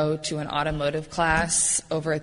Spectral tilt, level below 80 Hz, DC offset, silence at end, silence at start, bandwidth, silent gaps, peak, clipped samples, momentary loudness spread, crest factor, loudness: -3 dB/octave; -44 dBFS; under 0.1%; 0 s; 0 s; 11 kHz; none; -8 dBFS; under 0.1%; 7 LU; 18 dB; -24 LUFS